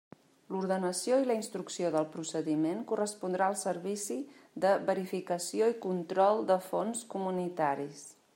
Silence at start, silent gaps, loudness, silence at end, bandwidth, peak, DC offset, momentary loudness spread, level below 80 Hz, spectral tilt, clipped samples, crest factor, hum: 0.5 s; none; -32 LUFS; 0.25 s; 16 kHz; -14 dBFS; under 0.1%; 9 LU; -84 dBFS; -5 dB/octave; under 0.1%; 18 dB; none